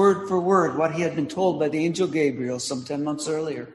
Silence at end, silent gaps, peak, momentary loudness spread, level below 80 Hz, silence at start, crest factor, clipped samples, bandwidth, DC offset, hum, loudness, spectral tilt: 0 s; none; -6 dBFS; 8 LU; -64 dBFS; 0 s; 16 dB; under 0.1%; 12 kHz; under 0.1%; none; -24 LUFS; -5.5 dB/octave